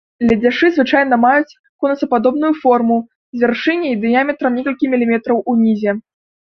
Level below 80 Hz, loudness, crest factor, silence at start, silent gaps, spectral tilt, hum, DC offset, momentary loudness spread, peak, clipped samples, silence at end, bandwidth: -52 dBFS; -15 LUFS; 14 dB; 0.2 s; 1.59-1.79 s, 3.15-3.33 s; -7 dB/octave; none; under 0.1%; 7 LU; -2 dBFS; under 0.1%; 0.55 s; 6.2 kHz